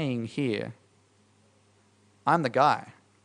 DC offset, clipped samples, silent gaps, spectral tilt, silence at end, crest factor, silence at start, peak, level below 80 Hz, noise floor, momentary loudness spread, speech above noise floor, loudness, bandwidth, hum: under 0.1%; under 0.1%; none; -6.5 dB/octave; 0.35 s; 22 dB; 0 s; -8 dBFS; -74 dBFS; -64 dBFS; 10 LU; 37 dB; -27 LUFS; 10.5 kHz; none